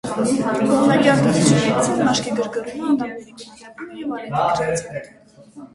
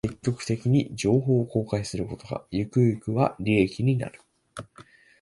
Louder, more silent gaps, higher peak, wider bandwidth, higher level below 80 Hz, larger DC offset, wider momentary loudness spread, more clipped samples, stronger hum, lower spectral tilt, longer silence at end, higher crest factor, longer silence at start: first, -19 LUFS vs -26 LUFS; neither; first, -2 dBFS vs -6 dBFS; about the same, 11.5 kHz vs 11.5 kHz; about the same, -52 dBFS vs -52 dBFS; neither; first, 20 LU vs 14 LU; neither; neither; second, -5 dB/octave vs -7 dB/octave; second, 0.1 s vs 0.4 s; about the same, 18 dB vs 18 dB; about the same, 0.05 s vs 0.05 s